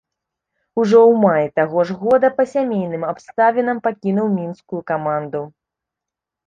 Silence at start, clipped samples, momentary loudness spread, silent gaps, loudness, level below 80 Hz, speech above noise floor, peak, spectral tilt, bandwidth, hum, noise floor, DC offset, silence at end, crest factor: 0.75 s; under 0.1%; 15 LU; none; -17 LUFS; -62 dBFS; 68 dB; -2 dBFS; -8 dB/octave; 7.4 kHz; none; -85 dBFS; under 0.1%; 1 s; 16 dB